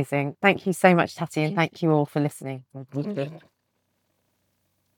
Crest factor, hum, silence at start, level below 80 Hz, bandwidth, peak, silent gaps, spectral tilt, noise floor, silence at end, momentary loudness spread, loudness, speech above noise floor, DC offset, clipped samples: 22 dB; none; 0 s; -74 dBFS; 18.5 kHz; -4 dBFS; none; -6.5 dB/octave; -74 dBFS; 1.6 s; 16 LU; -23 LUFS; 50 dB; under 0.1%; under 0.1%